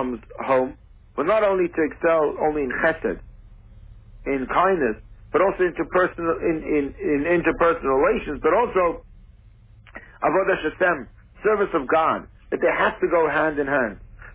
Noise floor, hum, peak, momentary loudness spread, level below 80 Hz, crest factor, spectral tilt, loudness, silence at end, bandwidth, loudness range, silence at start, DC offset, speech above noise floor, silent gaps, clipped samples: -49 dBFS; none; -8 dBFS; 10 LU; -46 dBFS; 16 dB; -9.5 dB/octave; -22 LUFS; 0 s; 4 kHz; 3 LU; 0 s; under 0.1%; 28 dB; none; under 0.1%